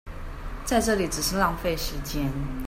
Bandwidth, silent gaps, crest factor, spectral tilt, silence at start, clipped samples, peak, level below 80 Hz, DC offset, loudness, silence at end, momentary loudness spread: 16 kHz; none; 18 dB; -4 dB/octave; 0.05 s; under 0.1%; -10 dBFS; -34 dBFS; under 0.1%; -26 LUFS; 0 s; 15 LU